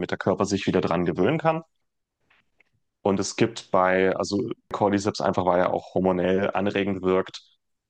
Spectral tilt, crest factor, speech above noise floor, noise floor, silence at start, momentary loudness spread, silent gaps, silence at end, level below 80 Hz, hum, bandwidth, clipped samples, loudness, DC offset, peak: -5.5 dB/octave; 18 dB; 54 dB; -77 dBFS; 0 s; 5 LU; none; 0.5 s; -64 dBFS; none; 9.8 kHz; under 0.1%; -24 LUFS; under 0.1%; -6 dBFS